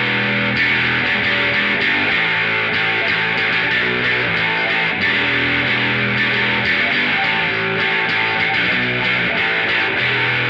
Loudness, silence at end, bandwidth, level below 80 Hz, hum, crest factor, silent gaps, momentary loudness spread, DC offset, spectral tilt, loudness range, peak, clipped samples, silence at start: -15 LUFS; 0 s; 8.2 kHz; -48 dBFS; none; 12 dB; none; 1 LU; under 0.1%; -5.5 dB/octave; 0 LU; -6 dBFS; under 0.1%; 0 s